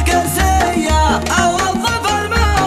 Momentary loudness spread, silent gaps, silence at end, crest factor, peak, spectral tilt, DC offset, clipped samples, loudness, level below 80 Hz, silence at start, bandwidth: 2 LU; none; 0 s; 14 dB; 0 dBFS; -4 dB/octave; under 0.1%; under 0.1%; -14 LUFS; -22 dBFS; 0 s; 15 kHz